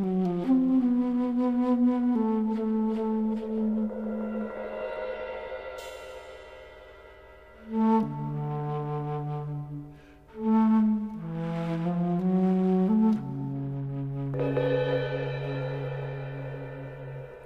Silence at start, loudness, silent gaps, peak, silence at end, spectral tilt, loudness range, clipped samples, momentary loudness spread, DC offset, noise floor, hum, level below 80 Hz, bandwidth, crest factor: 0 s; -28 LUFS; none; -14 dBFS; 0 s; -9.5 dB/octave; 8 LU; under 0.1%; 16 LU; under 0.1%; -50 dBFS; none; -58 dBFS; 7.6 kHz; 14 dB